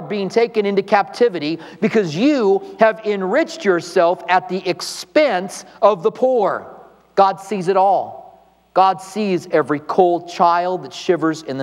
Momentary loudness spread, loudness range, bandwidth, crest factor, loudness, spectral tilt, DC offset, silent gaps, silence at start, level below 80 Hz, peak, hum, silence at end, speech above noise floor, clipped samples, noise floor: 7 LU; 1 LU; 13 kHz; 18 dB; -18 LUFS; -5.5 dB/octave; under 0.1%; none; 0 s; -68 dBFS; 0 dBFS; none; 0 s; 30 dB; under 0.1%; -47 dBFS